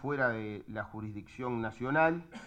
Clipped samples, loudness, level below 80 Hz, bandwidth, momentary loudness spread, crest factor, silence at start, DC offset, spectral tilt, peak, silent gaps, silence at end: under 0.1%; -34 LUFS; -62 dBFS; 9 kHz; 13 LU; 20 dB; 0 s; under 0.1%; -7.5 dB/octave; -14 dBFS; none; 0 s